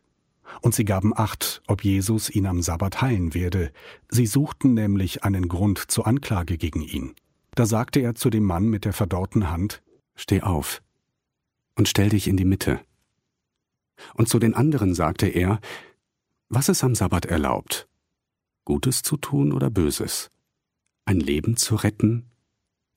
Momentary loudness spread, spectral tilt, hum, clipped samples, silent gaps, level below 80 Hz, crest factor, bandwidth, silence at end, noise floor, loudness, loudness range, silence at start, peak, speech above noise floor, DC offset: 9 LU; -5.5 dB/octave; none; under 0.1%; none; -42 dBFS; 18 dB; 16 kHz; 0.75 s; -84 dBFS; -23 LUFS; 2 LU; 0.45 s; -6 dBFS; 62 dB; under 0.1%